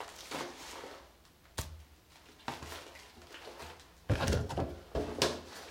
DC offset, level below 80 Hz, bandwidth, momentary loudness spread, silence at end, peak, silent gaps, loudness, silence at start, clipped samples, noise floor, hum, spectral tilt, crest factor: under 0.1%; -48 dBFS; 16.5 kHz; 21 LU; 0 s; -8 dBFS; none; -39 LUFS; 0 s; under 0.1%; -61 dBFS; none; -4.5 dB/octave; 30 dB